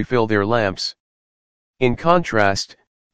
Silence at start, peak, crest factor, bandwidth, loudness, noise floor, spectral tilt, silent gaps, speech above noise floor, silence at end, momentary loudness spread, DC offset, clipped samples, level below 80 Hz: 0 s; 0 dBFS; 20 dB; 9.8 kHz; -19 LUFS; under -90 dBFS; -5 dB/octave; 1.00-1.74 s, 2.87-3.10 s; over 72 dB; 0 s; 10 LU; 2%; under 0.1%; -46 dBFS